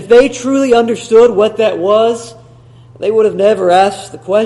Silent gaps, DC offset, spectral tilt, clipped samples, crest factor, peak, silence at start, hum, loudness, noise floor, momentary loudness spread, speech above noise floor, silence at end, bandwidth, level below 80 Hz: none; under 0.1%; -4.5 dB/octave; 0.2%; 10 dB; 0 dBFS; 0 s; none; -11 LUFS; -39 dBFS; 7 LU; 29 dB; 0 s; 11.5 kHz; -48 dBFS